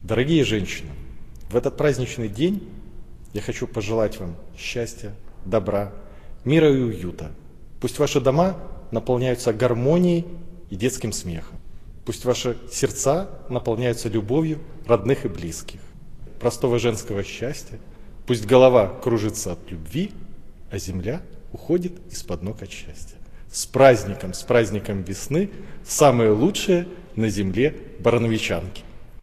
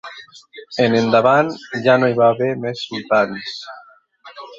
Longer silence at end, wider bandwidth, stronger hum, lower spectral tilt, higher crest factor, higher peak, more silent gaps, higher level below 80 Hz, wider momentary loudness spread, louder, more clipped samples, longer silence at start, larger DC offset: about the same, 0 s vs 0.05 s; first, 14.5 kHz vs 7.6 kHz; neither; about the same, -5.5 dB/octave vs -6 dB/octave; about the same, 22 dB vs 18 dB; about the same, 0 dBFS vs 0 dBFS; neither; first, -40 dBFS vs -62 dBFS; about the same, 18 LU vs 20 LU; second, -22 LUFS vs -17 LUFS; neither; about the same, 0 s vs 0.05 s; neither